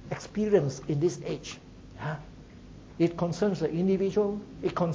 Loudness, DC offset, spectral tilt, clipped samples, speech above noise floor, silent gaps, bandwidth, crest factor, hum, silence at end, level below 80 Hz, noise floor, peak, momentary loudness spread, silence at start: -29 LUFS; under 0.1%; -7 dB/octave; under 0.1%; 20 dB; none; 8 kHz; 18 dB; none; 0 s; -54 dBFS; -48 dBFS; -10 dBFS; 23 LU; 0 s